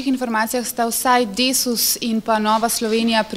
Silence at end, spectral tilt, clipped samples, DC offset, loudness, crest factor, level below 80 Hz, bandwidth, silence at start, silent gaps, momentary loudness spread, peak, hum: 0 s; -2 dB/octave; under 0.1%; under 0.1%; -18 LUFS; 16 dB; -54 dBFS; 16 kHz; 0 s; none; 4 LU; -2 dBFS; none